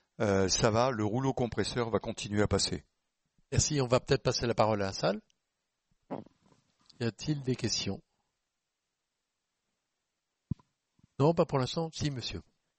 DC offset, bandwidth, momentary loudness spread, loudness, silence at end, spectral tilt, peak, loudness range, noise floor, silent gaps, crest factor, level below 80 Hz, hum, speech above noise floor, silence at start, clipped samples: under 0.1%; 8.4 kHz; 15 LU; -31 LUFS; 0.35 s; -4.5 dB/octave; -12 dBFS; 8 LU; -86 dBFS; none; 22 dB; -54 dBFS; none; 56 dB; 0.2 s; under 0.1%